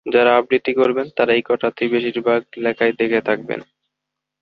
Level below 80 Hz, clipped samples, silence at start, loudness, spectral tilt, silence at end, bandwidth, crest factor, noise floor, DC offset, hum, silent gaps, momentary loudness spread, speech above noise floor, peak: -62 dBFS; under 0.1%; 0.05 s; -18 LUFS; -7.5 dB/octave; 0.8 s; 5.4 kHz; 18 dB; -81 dBFS; under 0.1%; none; none; 8 LU; 64 dB; -2 dBFS